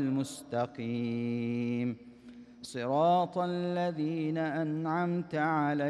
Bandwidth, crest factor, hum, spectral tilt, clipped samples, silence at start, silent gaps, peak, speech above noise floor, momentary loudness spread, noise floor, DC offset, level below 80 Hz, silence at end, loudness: 13 kHz; 14 dB; none; -7 dB/octave; under 0.1%; 0 s; none; -16 dBFS; 20 dB; 12 LU; -52 dBFS; under 0.1%; -74 dBFS; 0 s; -32 LUFS